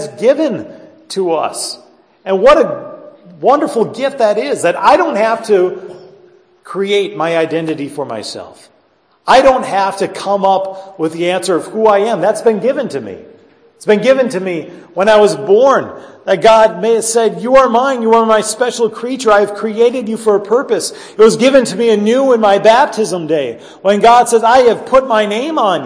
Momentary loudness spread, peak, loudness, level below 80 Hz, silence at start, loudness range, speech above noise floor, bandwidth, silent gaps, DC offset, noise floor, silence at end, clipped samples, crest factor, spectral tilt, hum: 13 LU; 0 dBFS; -12 LUFS; -48 dBFS; 0 s; 5 LU; 42 dB; 11 kHz; none; under 0.1%; -54 dBFS; 0 s; 0.1%; 12 dB; -4 dB/octave; none